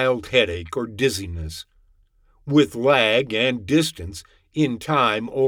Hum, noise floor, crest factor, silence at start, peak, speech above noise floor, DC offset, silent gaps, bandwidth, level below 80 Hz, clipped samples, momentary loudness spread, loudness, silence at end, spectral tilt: none; -58 dBFS; 18 dB; 0 s; -4 dBFS; 37 dB; under 0.1%; none; 17.5 kHz; -46 dBFS; under 0.1%; 17 LU; -20 LUFS; 0 s; -5 dB/octave